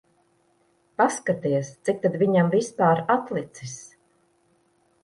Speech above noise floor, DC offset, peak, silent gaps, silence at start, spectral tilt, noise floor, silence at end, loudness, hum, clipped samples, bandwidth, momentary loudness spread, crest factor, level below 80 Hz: 42 dB; under 0.1%; -8 dBFS; none; 1 s; -6 dB/octave; -65 dBFS; 1.2 s; -23 LUFS; none; under 0.1%; 11.5 kHz; 17 LU; 18 dB; -68 dBFS